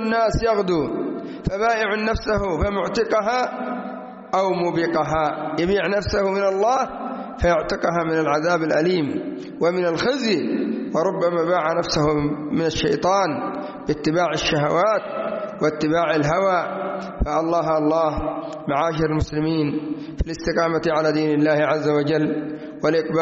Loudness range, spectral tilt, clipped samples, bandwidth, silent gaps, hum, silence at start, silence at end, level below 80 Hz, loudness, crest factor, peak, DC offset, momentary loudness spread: 2 LU; -4.5 dB/octave; under 0.1%; 8 kHz; none; none; 0 s; 0 s; -38 dBFS; -21 LUFS; 14 dB; -6 dBFS; under 0.1%; 8 LU